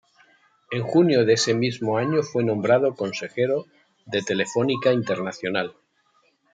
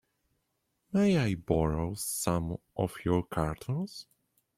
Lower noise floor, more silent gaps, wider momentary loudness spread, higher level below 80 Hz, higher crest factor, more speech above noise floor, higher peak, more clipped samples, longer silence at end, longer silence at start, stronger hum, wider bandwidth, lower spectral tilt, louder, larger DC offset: second, -65 dBFS vs -79 dBFS; neither; about the same, 10 LU vs 9 LU; second, -70 dBFS vs -50 dBFS; about the same, 18 dB vs 20 dB; second, 43 dB vs 49 dB; first, -6 dBFS vs -12 dBFS; neither; first, 0.8 s vs 0.55 s; second, 0.7 s vs 0.9 s; neither; second, 9.4 kHz vs 16 kHz; about the same, -5 dB/octave vs -6 dB/octave; first, -23 LUFS vs -31 LUFS; neither